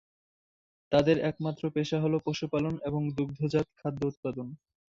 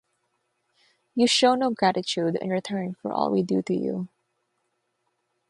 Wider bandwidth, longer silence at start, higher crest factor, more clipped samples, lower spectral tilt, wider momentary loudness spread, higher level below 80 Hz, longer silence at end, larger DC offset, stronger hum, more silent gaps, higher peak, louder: second, 7.6 kHz vs 11.5 kHz; second, 0.9 s vs 1.15 s; about the same, 20 dB vs 20 dB; neither; first, -7 dB/octave vs -4.5 dB/octave; about the same, 9 LU vs 11 LU; first, -60 dBFS vs -72 dBFS; second, 0.3 s vs 1.45 s; neither; neither; first, 4.17-4.23 s vs none; about the same, -10 dBFS vs -8 dBFS; second, -30 LUFS vs -24 LUFS